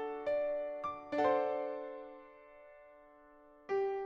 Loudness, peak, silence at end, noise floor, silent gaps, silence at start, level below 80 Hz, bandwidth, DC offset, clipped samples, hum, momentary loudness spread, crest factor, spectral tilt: -36 LUFS; -20 dBFS; 0 s; -61 dBFS; none; 0 s; -72 dBFS; 7.4 kHz; under 0.1%; under 0.1%; none; 25 LU; 18 dB; -6 dB/octave